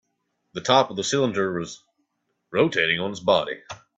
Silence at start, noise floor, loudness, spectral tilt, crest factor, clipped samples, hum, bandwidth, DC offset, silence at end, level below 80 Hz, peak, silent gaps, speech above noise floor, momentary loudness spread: 0.55 s; -75 dBFS; -23 LUFS; -4 dB/octave; 20 dB; under 0.1%; none; 8.4 kHz; under 0.1%; 0.2 s; -64 dBFS; -4 dBFS; none; 52 dB; 16 LU